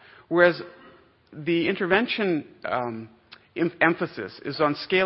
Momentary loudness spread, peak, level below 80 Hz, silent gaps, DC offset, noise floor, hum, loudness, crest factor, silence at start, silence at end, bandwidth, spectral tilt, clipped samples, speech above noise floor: 15 LU; -4 dBFS; -64 dBFS; none; under 0.1%; -53 dBFS; none; -24 LUFS; 22 dB; 0.3 s; 0 s; 5.8 kHz; -9.5 dB/octave; under 0.1%; 29 dB